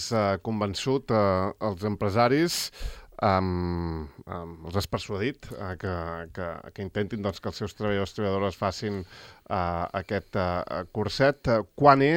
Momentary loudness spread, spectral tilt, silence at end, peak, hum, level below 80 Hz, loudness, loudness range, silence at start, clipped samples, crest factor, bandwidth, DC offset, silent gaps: 14 LU; -5.5 dB/octave; 0 s; -2 dBFS; none; -50 dBFS; -28 LUFS; 6 LU; 0 s; under 0.1%; 24 dB; 17 kHz; under 0.1%; none